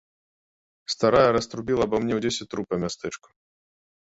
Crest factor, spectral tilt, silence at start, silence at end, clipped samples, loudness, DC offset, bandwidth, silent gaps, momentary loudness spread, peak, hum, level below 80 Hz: 20 dB; -5 dB/octave; 0.9 s; 0.95 s; under 0.1%; -24 LUFS; under 0.1%; 8.2 kHz; none; 16 LU; -6 dBFS; none; -52 dBFS